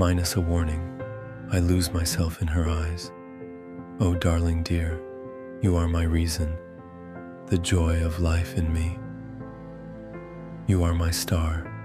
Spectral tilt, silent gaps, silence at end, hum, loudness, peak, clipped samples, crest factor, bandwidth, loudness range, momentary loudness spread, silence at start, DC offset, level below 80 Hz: -5.5 dB/octave; none; 0 s; none; -26 LUFS; -8 dBFS; under 0.1%; 18 dB; 15 kHz; 2 LU; 17 LU; 0 s; under 0.1%; -34 dBFS